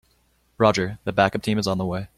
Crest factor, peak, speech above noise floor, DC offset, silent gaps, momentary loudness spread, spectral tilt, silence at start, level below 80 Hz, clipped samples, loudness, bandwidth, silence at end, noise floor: 20 dB; -2 dBFS; 42 dB; under 0.1%; none; 5 LU; -5.5 dB/octave; 0.6 s; -52 dBFS; under 0.1%; -22 LUFS; 14.5 kHz; 0.1 s; -64 dBFS